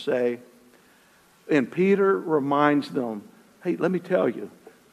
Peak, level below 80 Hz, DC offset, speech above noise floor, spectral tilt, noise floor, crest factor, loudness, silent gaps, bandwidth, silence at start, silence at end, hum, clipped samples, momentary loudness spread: -6 dBFS; -76 dBFS; under 0.1%; 34 dB; -7.5 dB/octave; -58 dBFS; 20 dB; -24 LUFS; none; 13.5 kHz; 0 s; 0.25 s; none; under 0.1%; 15 LU